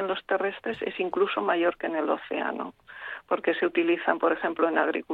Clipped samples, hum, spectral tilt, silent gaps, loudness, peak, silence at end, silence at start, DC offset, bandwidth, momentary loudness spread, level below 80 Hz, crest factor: under 0.1%; none; -7 dB/octave; none; -27 LUFS; -8 dBFS; 0 s; 0 s; under 0.1%; 4.5 kHz; 9 LU; -68 dBFS; 20 dB